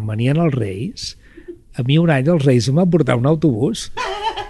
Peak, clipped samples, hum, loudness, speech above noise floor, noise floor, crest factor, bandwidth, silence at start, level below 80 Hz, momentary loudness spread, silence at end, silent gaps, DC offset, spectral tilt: -2 dBFS; under 0.1%; none; -17 LUFS; 22 dB; -38 dBFS; 14 dB; 12 kHz; 0 s; -44 dBFS; 11 LU; 0 s; none; under 0.1%; -6.5 dB/octave